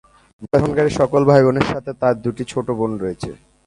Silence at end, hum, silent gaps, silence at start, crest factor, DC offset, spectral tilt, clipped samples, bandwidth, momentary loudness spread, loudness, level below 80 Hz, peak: 0.3 s; none; none; 0.4 s; 18 dB; under 0.1%; -7 dB/octave; under 0.1%; 11.5 kHz; 12 LU; -18 LUFS; -44 dBFS; 0 dBFS